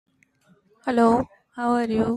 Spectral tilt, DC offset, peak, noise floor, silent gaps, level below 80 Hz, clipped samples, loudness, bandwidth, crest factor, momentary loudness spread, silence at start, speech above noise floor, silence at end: -7 dB/octave; under 0.1%; -6 dBFS; -61 dBFS; none; -54 dBFS; under 0.1%; -22 LUFS; 11 kHz; 18 dB; 13 LU; 0.85 s; 40 dB; 0 s